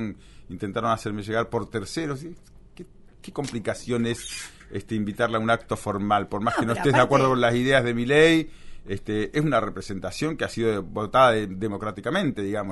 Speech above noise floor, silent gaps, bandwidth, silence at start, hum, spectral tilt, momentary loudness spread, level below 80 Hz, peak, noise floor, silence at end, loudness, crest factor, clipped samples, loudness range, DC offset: 21 dB; none; 11.5 kHz; 0 s; none; -5.5 dB/octave; 16 LU; -48 dBFS; -4 dBFS; -45 dBFS; 0 s; -24 LUFS; 20 dB; under 0.1%; 9 LU; under 0.1%